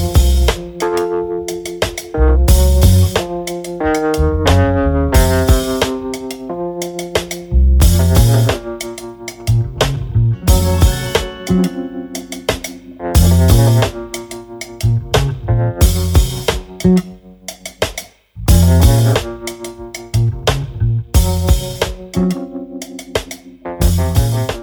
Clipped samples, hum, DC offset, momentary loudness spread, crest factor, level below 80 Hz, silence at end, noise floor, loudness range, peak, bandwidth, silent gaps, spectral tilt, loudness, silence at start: under 0.1%; none; under 0.1%; 15 LU; 14 dB; -18 dBFS; 0 s; -34 dBFS; 4 LU; 0 dBFS; over 20 kHz; none; -5.5 dB/octave; -15 LUFS; 0 s